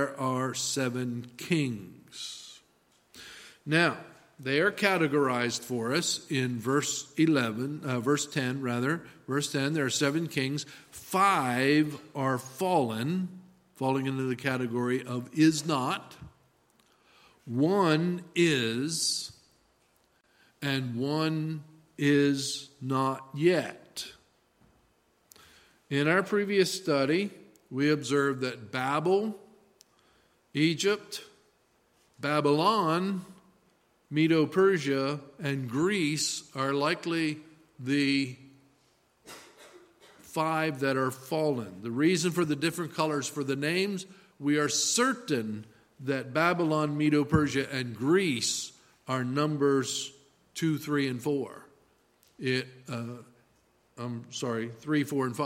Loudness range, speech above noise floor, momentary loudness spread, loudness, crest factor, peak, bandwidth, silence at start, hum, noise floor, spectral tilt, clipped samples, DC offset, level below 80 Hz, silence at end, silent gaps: 5 LU; 40 dB; 14 LU; -29 LUFS; 22 dB; -8 dBFS; 16.5 kHz; 0 s; none; -68 dBFS; -4.5 dB/octave; under 0.1%; under 0.1%; -66 dBFS; 0 s; none